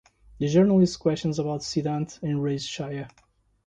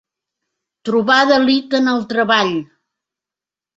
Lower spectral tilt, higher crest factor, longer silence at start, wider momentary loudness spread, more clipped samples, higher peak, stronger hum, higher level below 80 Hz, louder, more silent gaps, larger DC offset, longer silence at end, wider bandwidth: first, -6.5 dB/octave vs -4.5 dB/octave; about the same, 16 dB vs 16 dB; second, 0.4 s vs 0.85 s; first, 13 LU vs 8 LU; neither; second, -10 dBFS vs -2 dBFS; neither; first, -56 dBFS vs -62 dBFS; second, -25 LUFS vs -15 LUFS; neither; neither; second, 0.6 s vs 1.15 s; first, 9.2 kHz vs 7.8 kHz